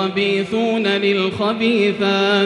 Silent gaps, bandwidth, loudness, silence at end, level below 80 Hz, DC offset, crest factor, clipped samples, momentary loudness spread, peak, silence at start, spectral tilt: none; 10.5 kHz; -17 LUFS; 0 s; -60 dBFS; under 0.1%; 12 dB; under 0.1%; 2 LU; -4 dBFS; 0 s; -5.5 dB/octave